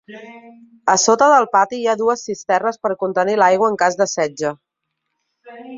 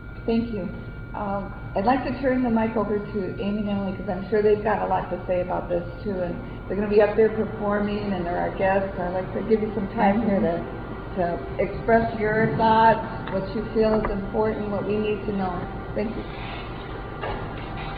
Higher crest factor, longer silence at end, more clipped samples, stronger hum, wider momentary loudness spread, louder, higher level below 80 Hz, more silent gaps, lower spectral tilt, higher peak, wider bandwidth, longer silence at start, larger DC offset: about the same, 18 dB vs 18 dB; about the same, 0 s vs 0 s; neither; neither; about the same, 11 LU vs 12 LU; first, -17 LUFS vs -25 LUFS; second, -66 dBFS vs -40 dBFS; neither; second, -3 dB/octave vs -10 dB/octave; first, 0 dBFS vs -6 dBFS; first, 7.8 kHz vs 5 kHz; about the same, 0.1 s vs 0 s; second, under 0.1% vs 0.2%